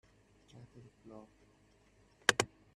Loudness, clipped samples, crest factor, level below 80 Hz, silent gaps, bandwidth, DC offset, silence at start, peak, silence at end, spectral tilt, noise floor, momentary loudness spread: -33 LUFS; under 0.1%; 34 dB; -72 dBFS; none; 12 kHz; under 0.1%; 1.1 s; -8 dBFS; 0.3 s; -1.5 dB/octave; -68 dBFS; 27 LU